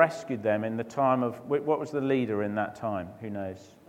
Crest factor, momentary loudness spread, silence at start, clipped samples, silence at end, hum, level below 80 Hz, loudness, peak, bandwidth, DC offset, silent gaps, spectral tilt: 22 dB; 11 LU; 0 s; under 0.1%; 0.2 s; none; -70 dBFS; -29 LUFS; -6 dBFS; 15.5 kHz; under 0.1%; none; -7 dB/octave